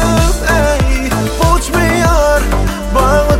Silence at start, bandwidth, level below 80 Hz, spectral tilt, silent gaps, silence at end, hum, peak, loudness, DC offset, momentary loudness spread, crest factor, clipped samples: 0 s; 16.5 kHz; -16 dBFS; -5 dB/octave; none; 0 s; none; 0 dBFS; -12 LUFS; under 0.1%; 4 LU; 10 dB; under 0.1%